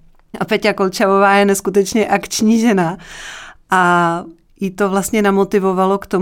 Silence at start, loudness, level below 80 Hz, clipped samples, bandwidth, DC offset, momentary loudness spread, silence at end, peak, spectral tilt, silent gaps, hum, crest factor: 0.35 s; -15 LUFS; -48 dBFS; under 0.1%; 17 kHz; under 0.1%; 14 LU; 0 s; -2 dBFS; -5 dB/octave; none; none; 14 dB